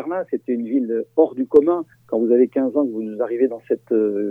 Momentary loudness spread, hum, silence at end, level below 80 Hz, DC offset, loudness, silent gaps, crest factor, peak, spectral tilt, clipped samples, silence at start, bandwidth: 9 LU; none; 0 s; -66 dBFS; under 0.1%; -20 LUFS; none; 18 dB; 0 dBFS; -9.5 dB/octave; under 0.1%; 0 s; 3.6 kHz